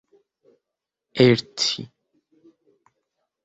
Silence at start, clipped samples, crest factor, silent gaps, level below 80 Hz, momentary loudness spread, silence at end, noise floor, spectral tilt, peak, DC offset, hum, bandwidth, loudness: 1.15 s; under 0.1%; 24 dB; none; -64 dBFS; 18 LU; 1.6 s; -85 dBFS; -5 dB/octave; -2 dBFS; under 0.1%; none; 8.2 kHz; -20 LUFS